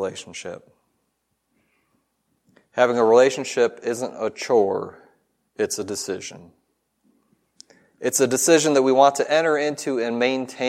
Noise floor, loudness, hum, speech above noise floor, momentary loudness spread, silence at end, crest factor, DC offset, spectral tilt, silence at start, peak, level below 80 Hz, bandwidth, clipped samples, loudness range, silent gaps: -73 dBFS; -20 LUFS; none; 53 dB; 17 LU; 0 s; 20 dB; under 0.1%; -3 dB/octave; 0 s; -2 dBFS; -72 dBFS; 16 kHz; under 0.1%; 8 LU; none